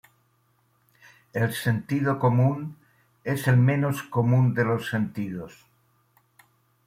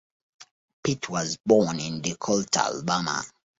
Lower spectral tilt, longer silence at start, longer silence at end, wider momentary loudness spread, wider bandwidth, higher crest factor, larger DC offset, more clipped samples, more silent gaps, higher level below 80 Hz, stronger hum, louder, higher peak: first, -7.5 dB/octave vs -4 dB/octave; first, 1.35 s vs 0.4 s; first, 1.4 s vs 0.3 s; first, 14 LU vs 9 LU; first, 15.5 kHz vs 8 kHz; about the same, 18 dB vs 22 dB; neither; neither; second, none vs 0.51-0.83 s, 1.40-1.44 s; about the same, -64 dBFS vs -60 dBFS; neither; about the same, -24 LUFS vs -26 LUFS; about the same, -8 dBFS vs -6 dBFS